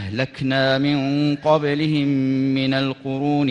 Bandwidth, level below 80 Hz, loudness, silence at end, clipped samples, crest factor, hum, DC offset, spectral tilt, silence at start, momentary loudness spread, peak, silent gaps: 7.4 kHz; -56 dBFS; -20 LUFS; 0 s; under 0.1%; 16 dB; none; under 0.1%; -7.5 dB/octave; 0 s; 5 LU; -4 dBFS; none